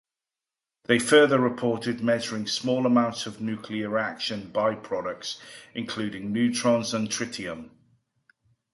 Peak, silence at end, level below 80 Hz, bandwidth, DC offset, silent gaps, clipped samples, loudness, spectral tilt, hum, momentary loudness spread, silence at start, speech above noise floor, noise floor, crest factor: -6 dBFS; 1.05 s; -66 dBFS; 11.5 kHz; under 0.1%; none; under 0.1%; -26 LUFS; -4 dB/octave; none; 14 LU; 0.9 s; 64 dB; -90 dBFS; 22 dB